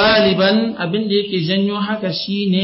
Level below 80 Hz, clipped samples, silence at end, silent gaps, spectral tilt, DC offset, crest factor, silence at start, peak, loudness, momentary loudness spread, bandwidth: -48 dBFS; under 0.1%; 0 s; none; -9.5 dB/octave; under 0.1%; 12 dB; 0 s; -4 dBFS; -17 LUFS; 8 LU; 5.8 kHz